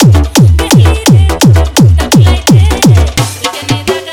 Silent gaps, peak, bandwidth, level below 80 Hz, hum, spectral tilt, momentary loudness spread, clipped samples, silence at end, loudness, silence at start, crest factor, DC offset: none; 0 dBFS; 19 kHz; -16 dBFS; none; -5.5 dB/octave; 7 LU; 10%; 0 s; -7 LUFS; 0 s; 6 dB; under 0.1%